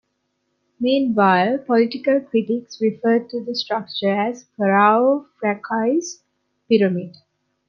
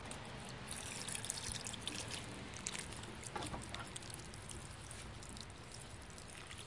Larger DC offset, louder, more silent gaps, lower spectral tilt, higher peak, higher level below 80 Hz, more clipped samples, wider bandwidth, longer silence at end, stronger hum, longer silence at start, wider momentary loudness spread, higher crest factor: neither; first, -19 LUFS vs -46 LUFS; neither; first, -5.5 dB/octave vs -2.5 dB/octave; first, -2 dBFS vs -18 dBFS; second, -70 dBFS vs -60 dBFS; neither; second, 7.2 kHz vs 11.5 kHz; first, 0.6 s vs 0 s; neither; first, 0.8 s vs 0 s; about the same, 9 LU vs 9 LU; second, 18 dB vs 30 dB